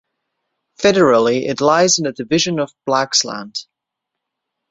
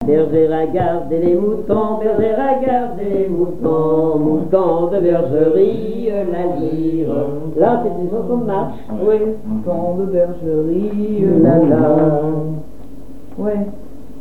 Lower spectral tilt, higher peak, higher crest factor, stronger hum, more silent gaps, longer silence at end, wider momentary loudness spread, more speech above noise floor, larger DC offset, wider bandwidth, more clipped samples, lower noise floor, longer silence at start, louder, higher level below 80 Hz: second, -3 dB/octave vs -10 dB/octave; about the same, 0 dBFS vs 0 dBFS; about the same, 18 dB vs 16 dB; neither; neither; first, 1.1 s vs 0 s; first, 11 LU vs 8 LU; first, 65 dB vs 21 dB; second, under 0.1% vs 5%; first, 8 kHz vs 4.6 kHz; neither; first, -81 dBFS vs -36 dBFS; first, 0.8 s vs 0 s; about the same, -15 LUFS vs -16 LUFS; second, -58 dBFS vs -44 dBFS